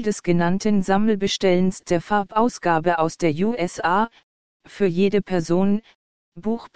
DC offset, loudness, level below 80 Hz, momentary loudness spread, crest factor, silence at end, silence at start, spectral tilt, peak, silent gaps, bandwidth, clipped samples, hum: 2%; -21 LUFS; -50 dBFS; 5 LU; 16 dB; 0 s; 0 s; -6 dB/octave; -4 dBFS; 4.23-4.60 s, 5.95-6.32 s; 9.4 kHz; under 0.1%; none